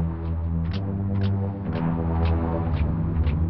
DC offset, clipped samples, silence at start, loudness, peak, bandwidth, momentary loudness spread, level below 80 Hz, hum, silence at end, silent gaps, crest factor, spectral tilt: 0.6%; under 0.1%; 0 s; -26 LUFS; -12 dBFS; 5.6 kHz; 4 LU; -30 dBFS; none; 0 s; none; 12 dB; -11 dB/octave